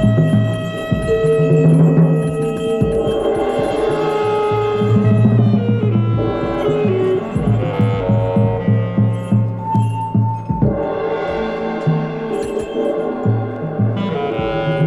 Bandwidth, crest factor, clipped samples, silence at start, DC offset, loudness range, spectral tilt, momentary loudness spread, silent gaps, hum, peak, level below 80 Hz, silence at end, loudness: 10.5 kHz; 16 dB; under 0.1%; 0 s; under 0.1%; 4 LU; -8.5 dB/octave; 7 LU; none; none; 0 dBFS; -38 dBFS; 0 s; -17 LUFS